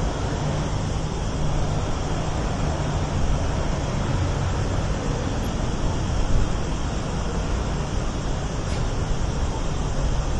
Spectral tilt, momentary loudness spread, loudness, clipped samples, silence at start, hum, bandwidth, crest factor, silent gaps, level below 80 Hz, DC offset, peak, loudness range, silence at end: -6 dB/octave; 2 LU; -26 LUFS; under 0.1%; 0 s; none; 12 kHz; 16 dB; none; -28 dBFS; under 0.1%; -8 dBFS; 2 LU; 0 s